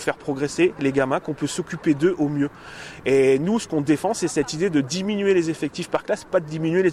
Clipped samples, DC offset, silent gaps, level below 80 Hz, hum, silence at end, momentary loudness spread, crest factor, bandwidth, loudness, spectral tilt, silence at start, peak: under 0.1%; under 0.1%; none; -56 dBFS; none; 0 s; 8 LU; 14 dB; 14 kHz; -22 LUFS; -5.5 dB/octave; 0 s; -8 dBFS